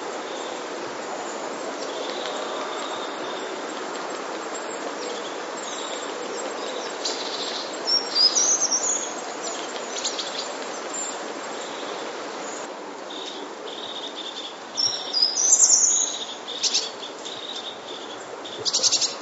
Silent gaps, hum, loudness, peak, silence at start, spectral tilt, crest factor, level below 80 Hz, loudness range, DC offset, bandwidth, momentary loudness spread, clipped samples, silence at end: none; none; -24 LUFS; -4 dBFS; 0 s; 1 dB/octave; 24 dB; -82 dBFS; 11 LU; under 0.1%; 8.2 kHz; 15 LU; under 0.1%; 0 s